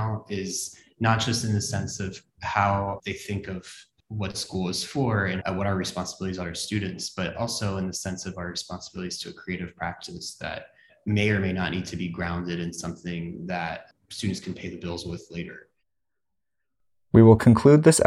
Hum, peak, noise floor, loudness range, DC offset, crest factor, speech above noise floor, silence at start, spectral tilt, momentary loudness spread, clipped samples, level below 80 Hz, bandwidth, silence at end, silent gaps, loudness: none; -4 dBFS; -86 dBFS; 8 LU; under 0.1%; 22 dB; 61 dB; 0 s; -5.5 dB/octave; 14 LU; under 0.1%; -54 dBFS; 13.5 kHz; 0 s; none; -26 LUFS